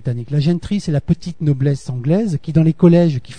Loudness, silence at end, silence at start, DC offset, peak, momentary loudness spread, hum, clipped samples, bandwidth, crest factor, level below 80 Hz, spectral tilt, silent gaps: -16 LUFS; 0 s; 0.05 s; 1%; 0 dBFS; 8 LU; none; under 0.1%; 9.6 kHz; 16 dB; -42 dBFS; -8.5 dB/octave; none